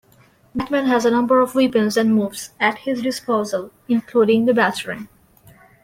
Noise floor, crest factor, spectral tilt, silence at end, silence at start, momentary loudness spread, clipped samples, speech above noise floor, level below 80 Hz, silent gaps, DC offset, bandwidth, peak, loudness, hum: -53 dBFS; 16 dB; -5 dB/octave; 0.8 s; 0.55 s; 12 LU; under 0.1%; 35 dB; -58 dBFS; none; under 0.1%; 16.5 kHz; -4 dBFS; -19 LUFS; none